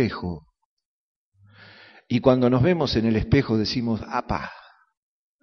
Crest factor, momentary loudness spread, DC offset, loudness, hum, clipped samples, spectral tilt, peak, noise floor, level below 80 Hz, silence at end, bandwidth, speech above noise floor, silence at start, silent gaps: 22 dB; 14 LU; under 0.1%; -22 LUFS; none; under 0.1%; -6 dB/octave; -2 dBFS; -54 dBFS; -44 dBFS; 0.8 s; 6.6 kHz; 32 dB; 0 s; 0.65-0.77 s, 0.85-1.32 s